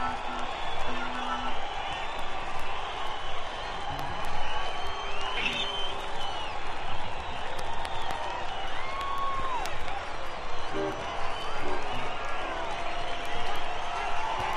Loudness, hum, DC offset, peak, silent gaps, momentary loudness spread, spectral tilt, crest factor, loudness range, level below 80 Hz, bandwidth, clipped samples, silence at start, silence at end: -33 LUFS; none; under 0.1%; -14 dBFS; none; 4 LU; -3.5 dB/octave; 14 dB; 2 LU; -38 dBFS; 9.6 kHz; under 0.1%; 0 s; 0 s